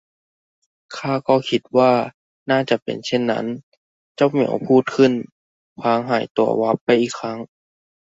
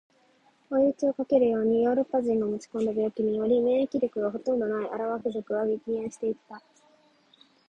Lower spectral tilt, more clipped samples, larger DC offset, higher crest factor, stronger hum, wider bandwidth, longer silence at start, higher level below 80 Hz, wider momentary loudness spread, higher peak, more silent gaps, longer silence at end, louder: about the same, -6 dB/octave vs -7 dB/octave; neither; neither; about the same, 18 dB vs 18 dB; neither; second, 7.8 kHz vs 9.2 kHz; first, 0.9 s vs 0.7 s; about the same, -64 dBFS vs -68 dBFS; first, 14 LU vs 7 LU; first, -2 dBFS vs -10 dBFS; first, 2.14-2.46 s, 2.82-2.86 s, 3.63-4.15 s, 5.32-5.76 s, 6.30-6.35 s, 6.81-6.86 s vs none; second, 0.75 s vs 1.1 s; first, -19 LUFS vs -27 LUFS